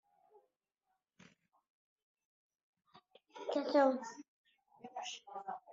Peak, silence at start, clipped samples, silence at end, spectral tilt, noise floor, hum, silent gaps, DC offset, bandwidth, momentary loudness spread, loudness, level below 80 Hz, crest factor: -18 dBFS; 2.95 s; under 0.1%; 0 s; -1.5 dB/octave; -87 dBFS; none; 4.28-4.44 s; under 0.1%; 7.6 kHz; 25 LU; -37 LUFS; under -90 dBFS; 24 dB